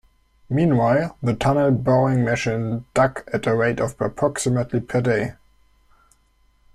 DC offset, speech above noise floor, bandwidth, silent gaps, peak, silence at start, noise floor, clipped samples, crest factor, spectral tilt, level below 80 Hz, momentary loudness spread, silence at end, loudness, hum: under 0.1%; 40 dB; 13 kHz; none; -4 dBFS; 0.5 s; -60 dBFS; under 0.1%; 16 dB; -6.5 dB/octave; -48 dBFS; 7 LU; 1.45 s; -21 LUFS; none